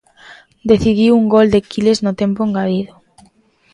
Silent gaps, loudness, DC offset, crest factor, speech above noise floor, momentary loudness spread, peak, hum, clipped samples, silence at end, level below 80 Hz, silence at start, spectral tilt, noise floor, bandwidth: none; -14 LUFS; under 0.1%; 14 dB; 39 dB; 10 LU; 0 dBFS; none; under 0.1%; 0.9 s; -42 dBFS; 0.3 s; -6.5 dB/octave; -52 dBFS; 10.5 kHz